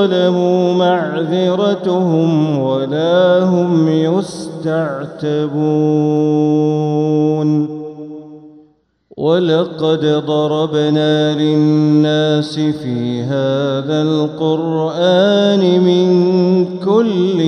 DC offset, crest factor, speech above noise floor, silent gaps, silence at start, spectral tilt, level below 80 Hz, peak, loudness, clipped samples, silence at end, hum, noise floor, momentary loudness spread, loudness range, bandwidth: under 0.1%; 14 dB; 39 dB; none; 0 s; -7.5 dB/octave; -62 dBFS; 0 dBFS; -14 LUFS; under 0.1%; 0 s; none; -53 dBFS; 7 LU; 4 LU; 10.5 kHz